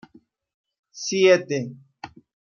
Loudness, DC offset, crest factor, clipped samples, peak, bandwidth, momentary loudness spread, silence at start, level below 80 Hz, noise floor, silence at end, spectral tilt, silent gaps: -21 LUFS; under 0.1%; 20 dB; under 0.1%; -4 dBFS; 7.2 kHz; 25 LU; 0.95 s; -72 dBFS; -56 dBFS; 0.5 s; -4 dB/octave; none